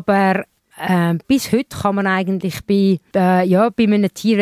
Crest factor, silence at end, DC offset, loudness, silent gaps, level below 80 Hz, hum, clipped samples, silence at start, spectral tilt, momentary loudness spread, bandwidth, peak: 14 dB; 0 s; under 0.1%; -17 LUFS; none; -50 dBFS; none; under 0.1%; 0 s; -6.5 dB/octave; 7 LU; 15.5 kHz; -4 dBFS